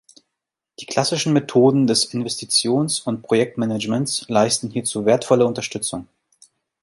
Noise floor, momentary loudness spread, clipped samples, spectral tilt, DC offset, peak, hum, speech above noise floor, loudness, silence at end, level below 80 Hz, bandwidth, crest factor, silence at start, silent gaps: -82 dBFS; 9 LU; under 0.1%; -4 dB/octave; under 0.1%; -2 dBFS; none; 63 dB; -19 LUFS; 0.8 s; -60 dBFS; 11.5 kHz; 18 dB; 0.8 s; none